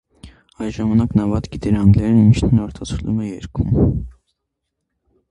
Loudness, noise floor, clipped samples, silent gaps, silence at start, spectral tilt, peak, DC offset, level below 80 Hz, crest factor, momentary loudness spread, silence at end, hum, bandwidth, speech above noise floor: -17 LUFS; -77 dBFS; under 0.1%; none; 0.25 s; -8.5 dB/octave; 0 dBFS; under 0.1%; -32 dBFS; 18 dB; 14 LU; 1.2 s; none; 10 kHz; 61 dB